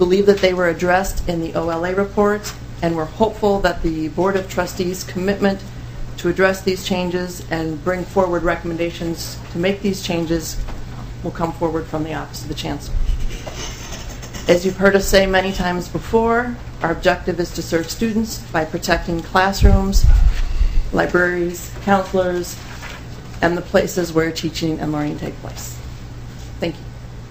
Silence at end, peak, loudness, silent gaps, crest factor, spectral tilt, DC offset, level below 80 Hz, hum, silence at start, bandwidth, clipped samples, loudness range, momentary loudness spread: 0 s; 0 dBFS; -20 LUFS; none; 18 dB; -5.5 dB/octave; 0.7%; -24 dBFS; none; 0 s; 15.5 kHz; under 0.1%; 6 LU; 15 LU